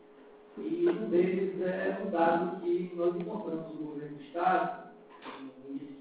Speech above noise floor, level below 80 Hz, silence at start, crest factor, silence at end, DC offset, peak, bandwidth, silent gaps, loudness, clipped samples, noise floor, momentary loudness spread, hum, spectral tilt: 24 dB; -74 dBFS; 0.1 s; 18 dB; 0 s; under 0.1%; -14 dBFS; 4 kHz; none; -32 LUFS; under 0.1%; -55 dBFS; 18 LU; none; -6 dB/octave